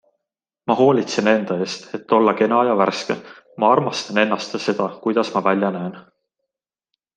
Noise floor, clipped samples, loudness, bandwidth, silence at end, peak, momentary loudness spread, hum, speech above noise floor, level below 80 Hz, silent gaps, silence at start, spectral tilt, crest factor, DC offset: -84 dBFS; under 0.1%; -19 LUFS; 9.4 kHz; 1.15 s; -2 dBFS; 11 LU; none; 65 dB; -66 dBFS; none; 0.65 s; -5.5 dB/octave; 18 dB; under 0.1%